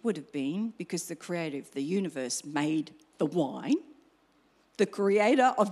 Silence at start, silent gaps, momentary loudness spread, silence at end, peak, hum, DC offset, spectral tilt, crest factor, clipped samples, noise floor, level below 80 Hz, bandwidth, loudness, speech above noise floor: 0.05 s; none; 12 LU; 0 s; -12 dBFS; none; under 0.1%; -5 dB/octave; 18 dB; under 0.1%; -66 dBFS; -82 dBFS; 13.5 kHz; -30 LUFS; 37 dB